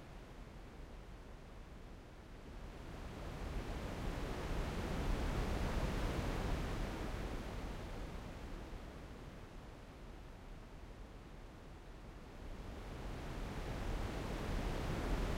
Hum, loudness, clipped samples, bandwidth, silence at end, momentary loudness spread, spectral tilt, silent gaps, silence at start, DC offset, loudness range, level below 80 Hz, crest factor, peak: none; -46 LUFS; under 0.1%; 16 kHz; 0 s; 15 LU; -6 dB/octave; none; 0 s; under 0.1%; 13 LU; -46 dBFS; 16 dB; -26 dBFS